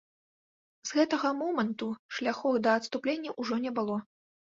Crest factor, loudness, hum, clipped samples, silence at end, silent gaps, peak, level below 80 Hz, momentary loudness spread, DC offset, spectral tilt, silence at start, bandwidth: 20 dB; -31 LUFS; none; under 0.1%; 0.45 s; 1.99-2.09 s; -12 dBFS; -76 dBFS; 8 LU; under 0.1%; -4.5 dB/octave; 0.85 s; 7.8 kHz